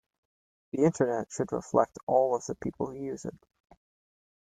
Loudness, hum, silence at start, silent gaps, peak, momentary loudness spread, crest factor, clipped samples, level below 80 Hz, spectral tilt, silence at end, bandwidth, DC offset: -30 LUFS; none; 0.75 s; 2.03-2.07 s; -8 dBFS; 12 LU; 22 dB; under 0.1%; -64 dBFS; -7 dB/octave; 1.1 s; 9.4 kHz; under 0.1%